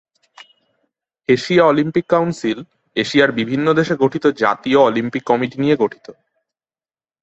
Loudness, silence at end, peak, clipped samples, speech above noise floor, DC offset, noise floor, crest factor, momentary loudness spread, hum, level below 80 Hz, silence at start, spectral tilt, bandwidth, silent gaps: -16 LUFS; 1.1 s; -2 dBFS; under 0.1%; over 74 dB; under 0.1%; under -90 dBFS; 16 dB; 9 LU; none; -58 dBFS; 1.3 s; -6 dB/octave; 8.2 kHz; none